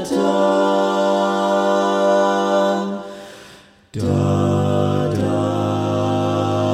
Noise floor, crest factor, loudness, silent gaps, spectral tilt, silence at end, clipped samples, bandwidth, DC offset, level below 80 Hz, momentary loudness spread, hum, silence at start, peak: -45 dBFS; 14 dB; -18 LUFS; none; -6.5 dB/octave; 0 s; under 0.1%; 14.5 kHz; under 0.1%; -58 dBFS; 9 LU; none; 0 s; -4 dBFS